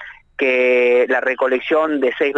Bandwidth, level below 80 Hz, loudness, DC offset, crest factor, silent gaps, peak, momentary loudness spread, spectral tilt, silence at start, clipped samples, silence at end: 6.4 kHz; -60 dBFS; -16 LUFS; under 0.1%; 10 dB; none; -6 dBFS; 5 LU; -4.5 dB/octave; 0 s; under 0.1%; 0 s